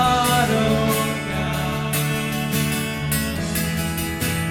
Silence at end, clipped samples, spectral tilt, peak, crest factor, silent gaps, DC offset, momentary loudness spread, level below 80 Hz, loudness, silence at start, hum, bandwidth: 0 s; under 0.1%; -4.5 dB/octave; -6 dBFS; 16 dB; none; under 0.1%; 6 LU; -38 dBFS; -21 LUFS; 0 s; none; 17.5 kHz